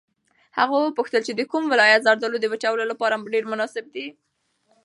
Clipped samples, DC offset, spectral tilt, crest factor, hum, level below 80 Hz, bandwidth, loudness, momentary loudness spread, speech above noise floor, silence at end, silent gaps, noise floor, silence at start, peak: under 0.1%; under 0.1%; -3 dB/octave; 22 dB; none; -80 dBFS; 11.5 kHz; -21 LUFS; 16 LU; 45 dB; 0.75 s; none; -67 dBFS; 0.55 s; -2 dBFS